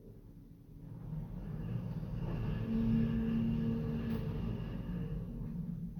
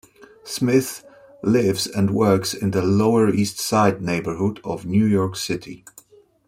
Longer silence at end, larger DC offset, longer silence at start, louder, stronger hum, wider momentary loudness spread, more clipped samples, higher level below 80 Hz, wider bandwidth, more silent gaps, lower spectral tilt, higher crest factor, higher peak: second, 0 s vs 0.7 s; neither; second, 0 s vs 0.45 s; second, -38 LUFS vs -20 LUFS; neither; first, 19 LU vs 12 LU; neither; first, -46 dBFS vs -56 dBFS; about the same, 17.5 kHz vs 16.5 kHz; neither; first, -10 dB/octave vs -5.5 dB/octave; about the same, 16 dB vs 18 dB; second, -20 dBFS vs -4 dBFS